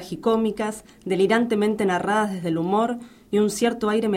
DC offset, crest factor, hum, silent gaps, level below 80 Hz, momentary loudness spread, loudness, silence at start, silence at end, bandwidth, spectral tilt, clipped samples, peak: under 0.1%; 16 dB; none; none; -58 dBFS; 8 LU; -23 LUFS; 0 s; 0 s; 16 kHz; -5.5 dB/octave; under 0.1%; -8 dBFS